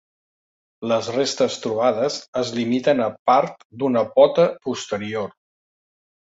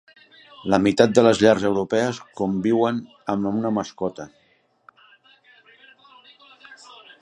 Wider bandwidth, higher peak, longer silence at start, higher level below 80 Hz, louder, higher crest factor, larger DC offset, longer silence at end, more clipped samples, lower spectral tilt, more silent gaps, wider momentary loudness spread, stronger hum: second, 8 kHz vs 11.5 kHz; about the same, -2 dBFS vs 0 dBFS; first, 0.8 s vs 0.65 s; second, -64 dBFS vs -58 dBFS; about the same, -21 LUFS vs -21 LUFS; about the same, 20 dB vs 22 dB; neither; first, 1 s vs 0.5 s; neither; about the same, -4.5 dB/octave vs -5.5 dB/octave; first, 2.28-2.33 s, 3.19-3.25 s, 3.65-3.70 s vs none; about the same, 12 LU vs 14 LU; neither